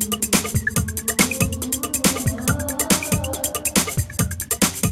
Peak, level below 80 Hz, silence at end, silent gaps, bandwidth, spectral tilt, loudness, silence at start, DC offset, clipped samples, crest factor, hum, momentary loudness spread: -2 dBFS; -36 dBFS; 0 s; none; 16.5 kHz; -3 dB/octave; -20 LUFS; 0 s; under 0.1%; under 0.1%; 20 dB; none; 4 LU